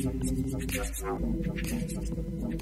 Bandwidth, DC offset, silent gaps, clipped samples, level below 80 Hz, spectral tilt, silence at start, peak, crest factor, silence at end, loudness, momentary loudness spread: 16 kHz; under 0.1%; none; under 0.1%; -36 dBFS; -5.5 dB/octave; 0 s; -18 dBFS; 14 dB; 0 s; -33 LUFS; 3 LU